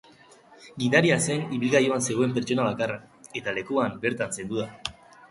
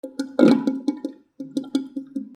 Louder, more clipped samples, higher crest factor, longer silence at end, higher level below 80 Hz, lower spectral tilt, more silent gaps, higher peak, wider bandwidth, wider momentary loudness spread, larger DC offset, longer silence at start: second, -25 LUFS vs -22 LUFS; neither; about the same, 22 dB vs 22 dB; first, 0.4 s vs 0 s; first, -62 dBFS vs -72 dBFS; second, -4.5 dB/octave vs -6.5 dB/octave; neither; second, -4 dBFS vs 0 dBFS; about the same, 11.5 kHz vs 11.5 kHz; second, 14 LU vs 17 LU; neither; first, 0.6 s vs 0.05 s